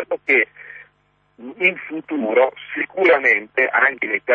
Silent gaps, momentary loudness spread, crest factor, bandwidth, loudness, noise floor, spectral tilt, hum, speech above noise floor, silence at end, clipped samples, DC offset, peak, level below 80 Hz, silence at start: none; 14 LU; 16 dB; 6.8 kHz; -17 LUFS; -62 dBFS; -5.5 dB/octave; 50 Hz at -65 dBFS; 43 dB; 0 s; under 0.1%; under 0.1%; -4 dBFS; -70 dBFS; 0 s